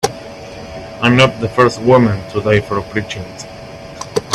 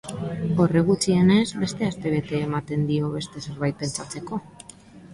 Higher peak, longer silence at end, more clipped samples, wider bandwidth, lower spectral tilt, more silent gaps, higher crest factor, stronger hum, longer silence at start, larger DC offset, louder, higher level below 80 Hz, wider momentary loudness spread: first, 0 dBFS vs -8 dBFS; about the same, 0 s vs 0 s; neither; first, 13.5 kHz vs 11.5 kHz; about the same, -5.5 dB/octave vs -6 dB/octave; neither; about the same, 16 dB vs 16 dB; neither; about the same, 0.05 s vs 0.05 s; neither; first, -14 LUFS vs -24 LUFS; first, -42 dBFS vs -52 dBFS; first, 20 LU vs 15 LU